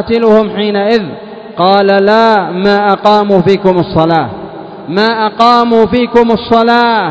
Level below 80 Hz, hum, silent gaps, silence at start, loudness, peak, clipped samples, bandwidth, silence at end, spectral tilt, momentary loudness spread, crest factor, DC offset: -40 dBFS; none; none; 0 s; -9 LUFS; 0 dBFS; 2%; 8 kHz; 0 s; -7 dB/octave; 11 LU; 10 dB; under 0.1%